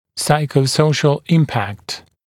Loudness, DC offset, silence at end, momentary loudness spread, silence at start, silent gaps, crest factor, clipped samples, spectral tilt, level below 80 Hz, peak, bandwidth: -16 LUFS; under 0.1%; 0.25 s; 11 LU; 0.15 s; none; 16 dB; under 0.1%; -5.5 dB/octave; -54 dBFS; 0 dBFS; 15.5 kHz